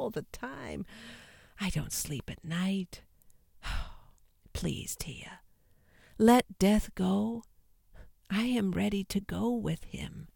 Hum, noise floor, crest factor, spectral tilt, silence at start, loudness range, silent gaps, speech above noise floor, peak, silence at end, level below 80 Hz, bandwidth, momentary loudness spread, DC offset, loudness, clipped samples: none; -64 dBFS; 22 dB; -5.5 dB/octave; 0 s; 9 LU; none; 32 dB; -10 dBFS; 0.05 s; -48 dBFS; 17.5 kHz; 19 LU; under 0.1%; -32 LUFS; under 0.1%